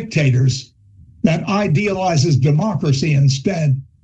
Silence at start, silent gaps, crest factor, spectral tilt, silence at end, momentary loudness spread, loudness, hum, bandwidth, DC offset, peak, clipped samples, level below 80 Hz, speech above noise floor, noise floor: 0 s; none; 14 dB; -6.5 dB/octave; 0.2 s; 4 LU; -17 LUFS; none; 8.2 kHz; under 0.1%; -2 dBFS; under 0.1%; -48 dBFS; 30 dB; -45 dBFS